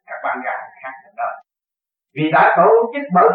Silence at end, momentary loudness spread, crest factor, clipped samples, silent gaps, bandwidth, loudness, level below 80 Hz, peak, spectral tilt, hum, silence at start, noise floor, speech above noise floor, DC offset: 0 s; 22 LU; 16 dB; under 0.1%; none; 4.7 kHz; -16 LUFS; -80 dBFS; -2 dBFS; -10.5 dB/octave; none; 0.1 s; -88 dBFS; 72 dB; under 0.1%